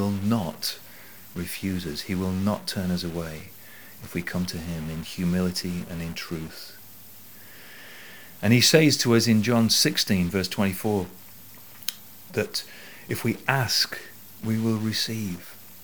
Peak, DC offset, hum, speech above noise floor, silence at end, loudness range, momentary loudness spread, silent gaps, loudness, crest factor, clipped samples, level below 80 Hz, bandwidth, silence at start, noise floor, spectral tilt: -2 dBFS; 0.5%; none; 22 dB; 0 s; 10 LU; 24 LU; none; -25 LUFS; 24 dB; under 0.1%; -54 dBFS; over 20 kHz; 0 s; -47 dBFS; -4 dB/octave